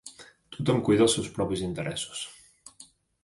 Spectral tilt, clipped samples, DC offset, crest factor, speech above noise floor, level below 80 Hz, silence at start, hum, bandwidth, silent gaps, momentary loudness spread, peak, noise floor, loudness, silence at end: -5 dB/octave; under 0.1%; under 0.1%; 18 dB; 29 dB; -56 dBFS; 0.05 s; none; 11.5 kHz; none; 24 LU; -10 dBFS; -55 dBFS; -27 LUFS; 0.4 s